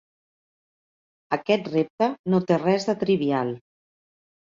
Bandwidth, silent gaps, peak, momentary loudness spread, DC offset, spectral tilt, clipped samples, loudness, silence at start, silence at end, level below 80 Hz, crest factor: 7.6 kHz; 1.90-1.98 s, 2.19-2.24 s; -6 dBFS; 8 LU; under 0.1%; -7 dB/octave; under 0.1%; -24 LUFS; 1.3 s; 0.9 s; -68 dBFS; 20 dB